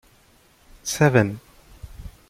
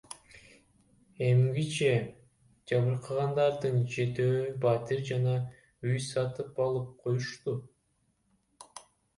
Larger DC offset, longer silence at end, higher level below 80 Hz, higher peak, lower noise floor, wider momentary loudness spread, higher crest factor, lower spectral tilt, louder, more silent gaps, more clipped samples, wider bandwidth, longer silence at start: neither; second, 0.2 s vs 0.4 s; first, -46 dBFS vs -66 dBFS; first, -2 dBFS vs -14 dBFS; second, -56 dBFS vs -74 dBFS; first, 24 LU vs 14 LU; first, 22 dB vs 16 dB; about the same, -5.5 dB/octave vs -6.5 dB/octave; first, -21 LUFS vs -30 LUFS; neither; neither; first, 16 kHz vs 11.5 kHz; first, 0.85 s vs 0.1 s